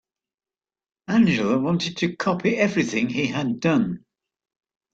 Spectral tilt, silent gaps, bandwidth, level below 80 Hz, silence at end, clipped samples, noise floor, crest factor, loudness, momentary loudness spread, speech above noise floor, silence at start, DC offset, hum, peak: -6 dB/octave; none; 7.8 kHz; -60 dBFS; 0.95 s; under 0.1%; under -90 dBFS; 16 dB; -22 LUFS; 5 LU; over 68 dB; 1.1 s; under 0.1%; none; -6 dBFS